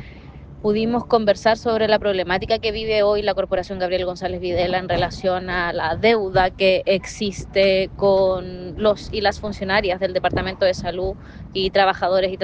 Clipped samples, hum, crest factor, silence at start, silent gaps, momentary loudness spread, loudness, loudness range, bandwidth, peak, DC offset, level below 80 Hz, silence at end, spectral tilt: under 0.1%; none; 16 dB; 0 s; none; 8 LU; -20 LUFS; 2 LU; 8.8 kHz; -4 dBFS; under 0.1%; -40 dBFS; 0 s; -5.5 dB/octave